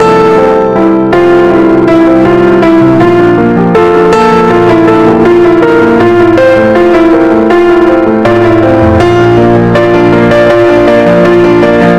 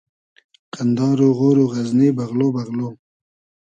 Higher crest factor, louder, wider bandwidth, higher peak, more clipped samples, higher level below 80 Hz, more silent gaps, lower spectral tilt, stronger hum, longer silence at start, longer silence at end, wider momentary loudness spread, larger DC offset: second, 4 dB vs 16 dB; first, -5 LUFS vs -18 LUFS; about the same, 8.8 kHz vs 8.4 kHz; first, 0 dBFS vs -4 dBFS; first, 4% vs under 0.1%; first, -30 dBFS vs -64 dBFS; neither; about the same, -7.5 dB/octave vs -8.5 dB/octave; neither; second, 0 s vs 0.75 s; second, 0 s vs 0.7 s; second, 1 LU vs 11 LU; neither